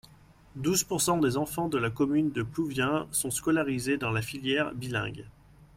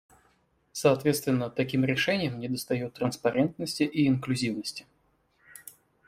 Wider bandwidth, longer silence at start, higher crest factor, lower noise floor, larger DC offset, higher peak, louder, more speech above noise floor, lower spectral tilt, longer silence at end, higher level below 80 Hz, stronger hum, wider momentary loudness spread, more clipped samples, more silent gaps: about the same, 16.5 kHz vs 16 kHz; second, 0.55 s vs 0.75 s; about the same, 18 dB vs 20 dB; second, -55 dBFS vs -69 dBFS; neither; second, -12 dBFS vs -8 dBFS; about the same, -29 LUFS vs -28 LUFS; second, 27 dB vs 42 dB; second, -4 dB/octave vs -5.5 dB/octave; second, 0.1 s vs 0.35 s; first, -56 dBFS vs -64 dBFS; neither; second, 6 LU vs 17 LU; neither; neither